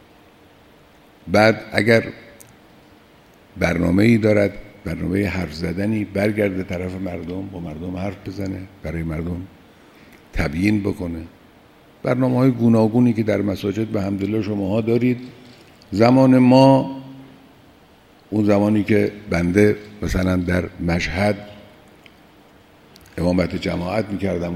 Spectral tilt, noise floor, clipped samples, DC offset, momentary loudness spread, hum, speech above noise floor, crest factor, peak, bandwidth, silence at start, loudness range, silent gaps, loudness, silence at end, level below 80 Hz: -7.5 dB/octave; -50 dBFS; under 0.1%; under 0.1%; 14 LU; none; 32 dB; 20 dB; 0 dBFS; 15 kHz; 1.25 s; 9 LU; none; -19 LUFS; 0 s; -42 dBFS